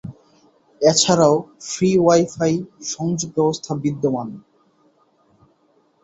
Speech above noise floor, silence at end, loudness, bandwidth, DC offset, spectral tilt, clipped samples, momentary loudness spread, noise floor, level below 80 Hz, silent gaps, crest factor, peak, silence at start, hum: 42 dB; 1.65 s; -19 LUFS; 8.2 kHz; under 0.1%; -4.5 dB/octave; under 0.1%; 13 LU; -61 dBFS; -58 dBFS; none; 20 dB; -2 dBFS; 0.05 s; none